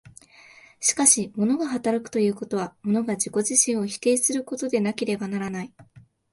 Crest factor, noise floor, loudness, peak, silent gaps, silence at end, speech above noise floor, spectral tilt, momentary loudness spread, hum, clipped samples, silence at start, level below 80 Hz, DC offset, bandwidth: 22 dB; -51 dBFS; -23 LUFS; -2 dBFS; none; 0.35 s; 27 dB; -3.5 dB/octave; 11 LU; none; under 0.1%; 0.8 s; -66 dBFS; under 0.1%; 12 kHz